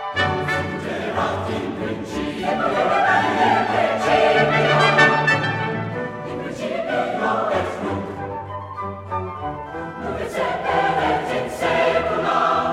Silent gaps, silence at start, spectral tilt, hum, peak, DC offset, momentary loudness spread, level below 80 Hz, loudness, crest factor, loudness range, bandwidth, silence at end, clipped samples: none; 0 s; -5.5 dB/octave; none; 0 dBFS; under 0.1%; 13 LU; -48 dBFS; -20 LUFS; 20 dB; 8 LU; 15 kHz; 0 s; under 0.1%